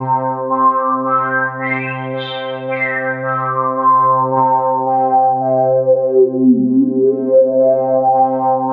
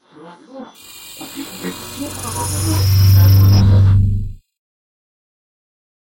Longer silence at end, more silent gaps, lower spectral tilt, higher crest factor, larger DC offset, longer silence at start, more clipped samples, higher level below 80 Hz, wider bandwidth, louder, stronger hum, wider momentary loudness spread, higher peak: second, 0 s vs 1.7 s; neither; first, -11 dB/octave vs -5.5 dB/octave; about the same, 12 dB vs 12 dB; neither; second, 0 s vs 0.25 s; neither; second, -76 dBFS vs -30 dBFS; second, 4.4 kHz vs 17 kHz; about the same, -14 LUFS vs -13 LUFS; neither; second, 7 LU vs 25 LU; about the same, -2 dBFS vs -2 dBFS